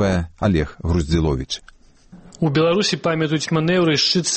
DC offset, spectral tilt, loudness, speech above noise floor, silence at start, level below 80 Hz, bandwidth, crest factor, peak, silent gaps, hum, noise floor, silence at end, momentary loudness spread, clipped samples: under 0.1%; -5 dB/octave; -19 LUFS; 27 dB; 0 s; -34 dBFS; 8.8 kHz; 14 dB; -6 dBFS; none; none; -46 dBFS; 0 s; 7 LU; under 0.1%